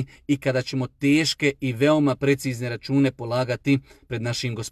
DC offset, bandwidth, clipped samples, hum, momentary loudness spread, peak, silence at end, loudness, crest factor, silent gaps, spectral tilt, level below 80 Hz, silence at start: under 0.1%; 14.5 kHz; under 0.1%; none; 8 LU; -8 dBFS; 0 s; -23 LUFS; 16 dB; none; -5.5 dB/octave; -56 dBFS; 0 s